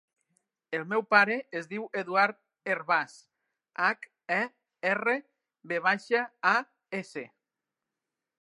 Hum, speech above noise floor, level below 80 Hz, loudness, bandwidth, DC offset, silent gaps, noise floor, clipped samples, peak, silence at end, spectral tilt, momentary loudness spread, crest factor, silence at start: none; 60 dB; -88 dBFS; -29 LUFS; 11.5 kHz; under 0.1%; none; -88 dBFS; under 0.1%; -6 dBFS; 1.15 s; -4.5 dB/octave; 14 LU; 26 dB; 0.7 s